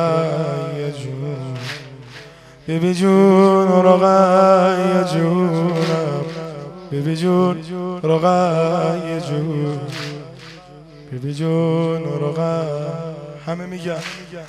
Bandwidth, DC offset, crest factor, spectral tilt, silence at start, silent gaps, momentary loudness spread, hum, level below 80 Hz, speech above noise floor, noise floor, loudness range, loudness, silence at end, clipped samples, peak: 12.5 kHz; under 0.1%; 18 dB; -7 dB/octave; 0 s; none; 19 LU; none; -56 dBFS; 25 dB; -41 dBFS; 9 LU; -18 LUFS; 0 s; under 0.1%; 0 dBFS